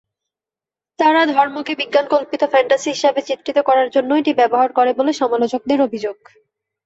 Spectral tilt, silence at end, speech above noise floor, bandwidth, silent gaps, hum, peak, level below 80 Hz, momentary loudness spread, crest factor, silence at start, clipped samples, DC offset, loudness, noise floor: -3.5 dB/octave; 0.7 s; 73 dB; 8 kHz; none; none; -2 dBFS; -66 dBFS; 5 LU; 16 dB; 1 s; under 0.1%; under 0.1%; -16 LUFS; -89 dBFS